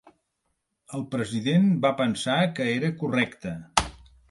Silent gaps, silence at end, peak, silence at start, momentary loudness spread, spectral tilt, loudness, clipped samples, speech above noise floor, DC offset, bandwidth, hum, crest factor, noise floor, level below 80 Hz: none; 0.35 s; -2 dBFS; 0.9 s; 13 LU; -5.5 dB/octave; -25 LUFS; under 0.1%; 52 dB; under 0.1%; 11.5 kHz; none; 24 dB; -77 dBFS; -50 dBFS